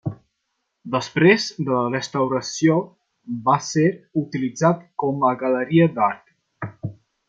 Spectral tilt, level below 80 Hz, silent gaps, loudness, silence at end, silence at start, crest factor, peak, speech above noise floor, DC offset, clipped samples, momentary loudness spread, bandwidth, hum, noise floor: -6 dB/octave; -62 dBFS; none; -20 LUFS; 0.35 s; 0.05 s; 20 dB; -2 dBFS; 56 dB; under 0.1%; under 0.1%; 16 LU; 7.8 kHz; none; -75 dBFS